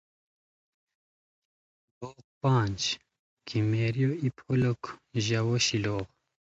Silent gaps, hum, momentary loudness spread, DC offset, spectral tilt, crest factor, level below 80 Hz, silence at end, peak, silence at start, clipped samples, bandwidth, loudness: 2.24-2.41 s, 3.19-3.37 s; none; 19 LU; under 0.1%; -5 dB/octave; 18 dB; -58 dBFS; 0.4 s; -12 dBFS; 2 s; under 0.1%; 8 kHz; -29 LUFS